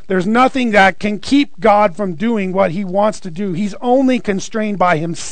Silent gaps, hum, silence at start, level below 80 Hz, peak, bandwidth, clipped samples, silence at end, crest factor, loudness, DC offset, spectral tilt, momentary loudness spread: none; none; 0.1 s; -48 dBFS; 0 dBFS; 9.4 kHz; under 0.1%; 0 s; 14 dB; -15 LUFS; 4%; -5.5 dB/octave; 9 LU